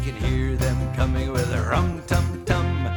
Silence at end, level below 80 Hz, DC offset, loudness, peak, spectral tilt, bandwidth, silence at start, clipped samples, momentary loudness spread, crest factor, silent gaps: 0 s; -28 dBFS; under 0.1%; -24 LUFS; -4 dBFS; -6.5 dB/octave; 19.5 kHz; 0 s; under 0.1%; 1 LU; 18 dB; none